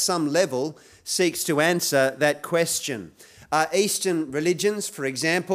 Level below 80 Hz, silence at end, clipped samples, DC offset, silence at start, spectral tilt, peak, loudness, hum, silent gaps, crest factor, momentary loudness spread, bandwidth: -68 dBFS; 0 s; under 0.1%; under 0.1%; 0 s; -3 dB/octave; -6 dBFS; -23 LUFS; none; none; 18 dB; 7 LU; 16 kHz